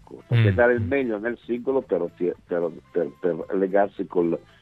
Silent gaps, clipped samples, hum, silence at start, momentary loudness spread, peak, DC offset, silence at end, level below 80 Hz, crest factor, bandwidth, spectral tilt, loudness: none; under 0.1%; none; 0.1 s; 8 LU; -4 dBFS; under 0.1%; 0.2 s; -56 dBFS; 20 dB; 4.5 kHz; -9.5 dB/octave; -24 LUFS